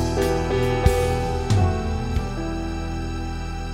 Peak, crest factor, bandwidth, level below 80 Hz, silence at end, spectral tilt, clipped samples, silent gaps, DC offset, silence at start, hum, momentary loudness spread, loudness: -4 dBFS; 18 dB; 16.5 kHz; -30 dBFS; 0 s; -6.5 dB/octave; under 0.1%; none; under 0.1%; 0 s; none; 9 LU; -24 LUFS